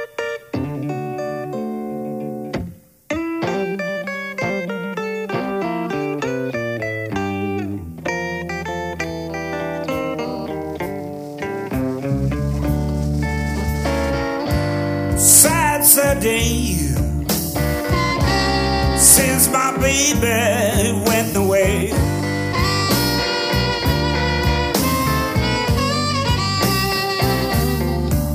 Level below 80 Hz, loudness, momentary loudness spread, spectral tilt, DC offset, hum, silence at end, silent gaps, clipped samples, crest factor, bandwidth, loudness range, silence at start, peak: -30 dBFS; -18 LUFS; 13 LU; -3.5 dB/octave; under 0.1%; none; 0 s; none; under 0.1%; 18 dB; 16 kHz; 11 LU; 0 s; 0 dBFS